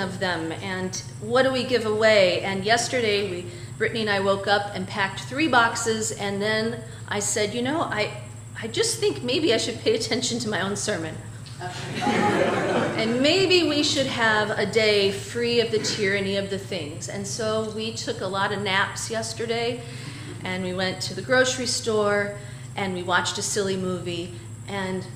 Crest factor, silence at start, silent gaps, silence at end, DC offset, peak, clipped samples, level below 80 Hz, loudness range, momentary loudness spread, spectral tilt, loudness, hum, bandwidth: 20 dB; 0 s; none; 0 s; under 0.1%; -4 dBFS; under 0.1%; -56 dBFS; 5 LU; 12 LU; -3.5 dB/octave; -24 LUFS; none; 15.5 kHz